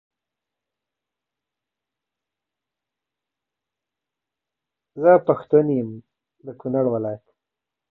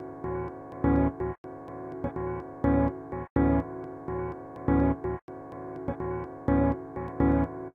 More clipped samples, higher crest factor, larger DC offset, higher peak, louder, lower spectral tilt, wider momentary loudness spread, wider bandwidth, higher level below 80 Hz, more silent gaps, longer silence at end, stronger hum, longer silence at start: neither; about the same, 22 dB vs 18 dB; neither; first, -2 dBFS vs -10 dBFS; first, -20 LUFS vs -30 LUFS; about the same, -12 dB/octave vs -11.5 dB/octave; first, 18 LU vs 13 LU; first, 4 kHz vs 3.6 kHz; second, -68 dBFS vs -40 dBFS; second, none vs 1.38-1.44 s, 3.30-3.36 s, 5.22-5.28 s; first, 0.75 s vs 0.05 s; neither; first, 4.95 s vs 0 s